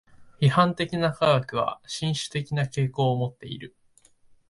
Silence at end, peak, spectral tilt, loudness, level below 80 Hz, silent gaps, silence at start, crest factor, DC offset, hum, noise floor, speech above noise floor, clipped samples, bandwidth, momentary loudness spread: 0.8 s; -6 dBFS; -6 dB/octave; -25 LUFS; -58 dBFS; none; 0.2 s; 20 dB; under 0.1%; none; -59 dBFS; 35 dB; under 0.1%; 11.5 kHz; 14 LU